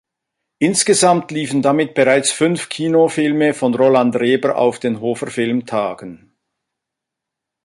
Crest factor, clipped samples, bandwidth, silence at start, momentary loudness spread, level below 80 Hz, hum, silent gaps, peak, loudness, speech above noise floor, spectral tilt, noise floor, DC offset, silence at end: 16 dB; under 0.1%; 11.5 kHz; 0.6 s; 8 LU; -62 dBFS; none; none; -2 dBFS; -16 LUFS; 66 dB; -4 dB/octave; -82 dBFS; under 0.1%; 1.5 s